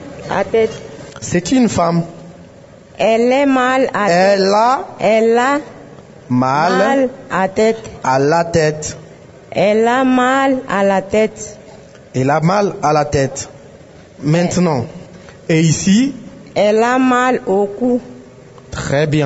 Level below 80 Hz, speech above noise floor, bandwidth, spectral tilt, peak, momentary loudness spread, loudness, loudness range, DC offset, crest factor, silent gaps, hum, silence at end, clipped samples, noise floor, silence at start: -46 dBFS; 26 dB; 8 kHz; -5.5 dB/octave; -2 dBFS; 13 LU; -14 LUFS; 3 LU; under 0.1%; 14 dB; none; none; 0 s; under 0.1%; -40 dBFS; 0 s